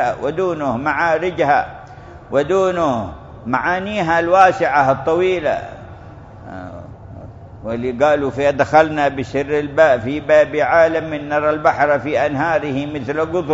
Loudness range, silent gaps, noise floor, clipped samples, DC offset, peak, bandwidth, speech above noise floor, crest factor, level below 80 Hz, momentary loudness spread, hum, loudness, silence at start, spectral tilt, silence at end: 5 LU; none; -37 dBFS; under 0.1%; under 0.1%; 0 dBFS; 7.8 kHz; 21 dB; 18 dB; -44 dBFS; 19 LU; none; -16 LUFS; 0 s; -6 dB/octave; 0 s